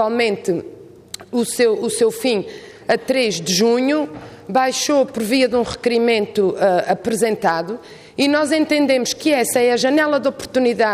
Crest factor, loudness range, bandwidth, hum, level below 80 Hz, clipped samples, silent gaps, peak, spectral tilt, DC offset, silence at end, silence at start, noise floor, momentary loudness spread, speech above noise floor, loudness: 12 dB; 2 LU; 15.5 kHz; none; -56 dBFS; under 0.1%; none; -4 dBFS; -3.5 dB/octave; under 0.1%; 0 s; 0 s; -37 dBFS; 10 LU; 20 dB; -18 LUFS